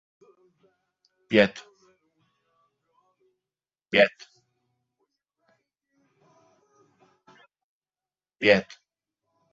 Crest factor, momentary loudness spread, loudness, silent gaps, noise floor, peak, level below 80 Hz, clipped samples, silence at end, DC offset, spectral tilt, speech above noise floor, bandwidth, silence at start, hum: 28 dB; 12 LU; -23 LUFS; 7.64-7.82 s; under -90 dBFS; -4 dBFS; -68 dBFS; under 0.1%; 0.9 s; under 0.1%; -2.5 dB/octave; over 69 dB; 7.6 kHz; 1.3 s; none